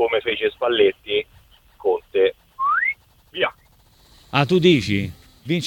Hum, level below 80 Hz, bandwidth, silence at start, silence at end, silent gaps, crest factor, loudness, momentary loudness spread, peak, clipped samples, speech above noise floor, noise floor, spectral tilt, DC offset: none; -54 dBFS; 17 kHz; 0 s; 0 s; none; 18 dB; -20 LUFS; 13 LU; -2 dBFS; under 0.1%; 36 dB; -54 dBFS; -6 dB/octave; under 0.1%